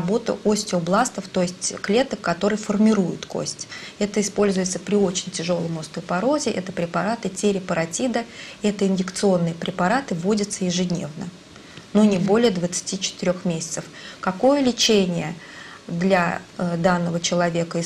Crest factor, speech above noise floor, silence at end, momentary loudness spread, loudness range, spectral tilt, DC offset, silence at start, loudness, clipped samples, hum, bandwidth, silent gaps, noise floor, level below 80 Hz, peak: 16 dB; 21 dB; 0 s; 10 LU; 2 LU; -4.5 dB/octave; under 0.1%; 0 s; -22 LUFS; under 0.1%; none; 13.5 kHz; none; -43 dBFS; -56 dBFS; -6 dBFS